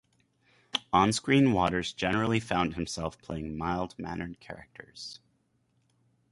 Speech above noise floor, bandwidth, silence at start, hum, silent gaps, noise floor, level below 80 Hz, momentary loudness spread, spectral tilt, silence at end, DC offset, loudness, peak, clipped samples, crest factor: 43 dB; 11.5 kHz; 0.75 s; none; none; -72 dBFS; -52 dBFS; 19 LU; -5 dB/octave; 1.15 s; under 0.1%; -29 LUFS; -8 dBFS; under 0.1%; 22 dB